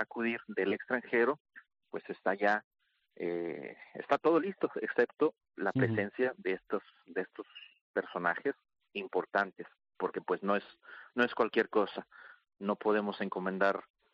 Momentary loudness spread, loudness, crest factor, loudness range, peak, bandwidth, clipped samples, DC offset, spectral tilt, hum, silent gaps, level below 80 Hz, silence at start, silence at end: 15 LU; -34 LUFS; 20 dB; 4 LU; -14 dBFS; 7 kHz; under 0.1%; under 0.1%; -7.5 dB/octave; none; 1.40-1.45 s, 2.64-2.71 s, 7.81-7.94 s; -78 dBFS; 0 s; 0.35 s